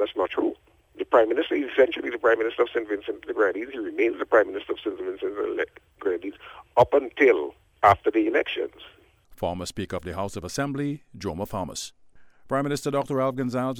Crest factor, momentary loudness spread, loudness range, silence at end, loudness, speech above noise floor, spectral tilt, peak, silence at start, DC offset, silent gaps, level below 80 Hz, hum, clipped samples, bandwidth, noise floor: 22 dB; 12 LU; 8 LU; 0 s; -25 LUFS; 24 dB; -5.5 dB/octave; -4 dBFS; 0 s; under 0.1%; none; -54 dBFS; none; under 0.1%; 17 kHz; -49 dBFS